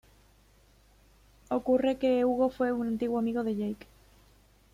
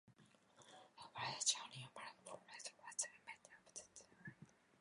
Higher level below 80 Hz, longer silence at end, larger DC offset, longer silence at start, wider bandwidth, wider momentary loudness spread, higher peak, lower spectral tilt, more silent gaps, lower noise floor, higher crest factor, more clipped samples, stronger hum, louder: first, -60 dBFS vs -90 dBFS; first, 1 s vs 0.3 s; neither; first, 1.5 s vs 0.05 s; first, 14.5 kHz vs 11 kHz; second, 8 LU vs 24 LU; first, -14 dBFS vs -22 dBFS; first, -7 dB/octave vs 0 dB/octave; neither; second, -61 dBFS vs -71 dBFS; second, 16 dB vs 28 dB; neither; neither; first, -29 LUFS vs -47 LUFS